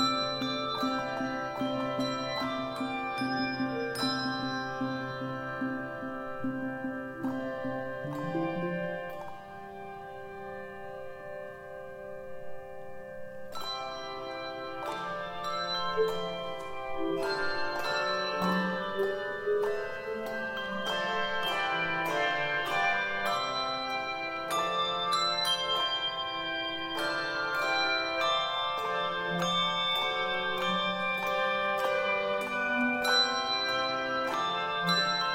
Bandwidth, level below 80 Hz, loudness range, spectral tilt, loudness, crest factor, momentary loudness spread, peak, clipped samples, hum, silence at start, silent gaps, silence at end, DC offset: 16 kHz; -62 dBFS; 11 LU; -4 dB/octave; -31 LUFS; 18 dB; 15 LU; -14 dBFS; under 0.1%; none; 0 s; none; 0 s; under 0.1%